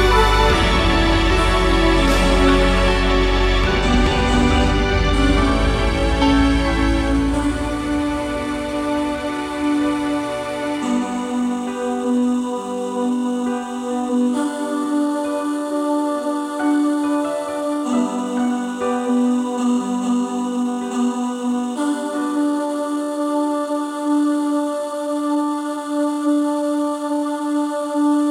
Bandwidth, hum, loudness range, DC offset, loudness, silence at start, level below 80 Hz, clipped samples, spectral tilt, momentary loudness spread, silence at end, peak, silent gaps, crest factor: 14 kHz; none; 5 LU; under 0.1%; -19 LUFS; 0 s; -26 dBFS; under 0.1%; -5.5 dB/octave; 7 LU; 0 s; -2 dBFS; none; 16 dB